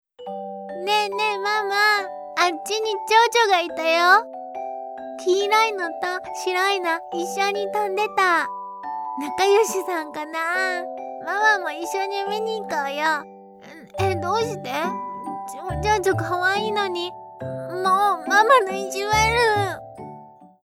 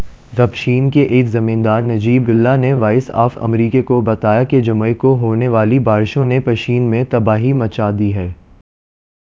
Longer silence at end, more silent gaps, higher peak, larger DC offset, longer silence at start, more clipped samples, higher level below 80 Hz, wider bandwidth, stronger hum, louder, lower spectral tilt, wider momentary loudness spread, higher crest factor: second, 0.2 s vs 0.9 s; neither; second, -4 dBFS vs 0 dBFS; neither; first, 0.2 s vs 0 s; neither; second, -48 dBFS vs -40 dBFS; first, 17 kHz vs 7.2 kHz; neither; second, -21 LUFS vs -14 LUFS; second, -3.5 dB/octave vs -9 dB/octave; first, 15 LU vs 4 LU; first, 20 dB vs 14 dB